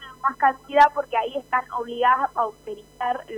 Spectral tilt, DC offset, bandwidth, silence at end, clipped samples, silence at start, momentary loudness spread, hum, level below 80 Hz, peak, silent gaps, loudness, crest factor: -3.5 dB/octave; under 0.1%; 13.5 kHz; 0 s; under 0.1%; 0 s; 12 LU; 50 Hz at -60 dBFS; -58 dBFS; -6 dBFS; none; -22 LUFS; 18 dB